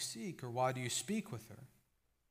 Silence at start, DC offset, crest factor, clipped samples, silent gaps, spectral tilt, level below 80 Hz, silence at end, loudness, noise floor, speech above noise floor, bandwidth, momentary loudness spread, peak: 0 s; under 0.1%; 20 dB; under 0.1%; none; -4 dB/octave; -78 dBFS; 0.65 s; -40 LUFS; -80 dBFS; 39 dB; 15.5 kHz; 17 LU; -24 dBFS